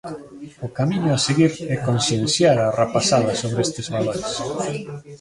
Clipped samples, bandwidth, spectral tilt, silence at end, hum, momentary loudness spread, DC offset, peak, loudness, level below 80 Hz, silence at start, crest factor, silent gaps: under 0.1%; 11.5 kHz; -5 dB/octave; 0.05 s; none; 15 LU; under 0.1%; -2 dBFS; -20 LUFS; -52 dBFS; 0.05 s; 18 dB; none